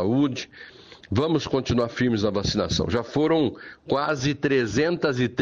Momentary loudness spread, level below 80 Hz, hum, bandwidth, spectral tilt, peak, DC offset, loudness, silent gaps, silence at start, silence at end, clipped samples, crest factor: 7 LU; -46 dBFS; none; 7.8 kHz; -5.5 dB/octave; -10 dBFS; under 0.1%; -24 LUFS; none; 0 s; 0 s; under 0.1%; 14 dB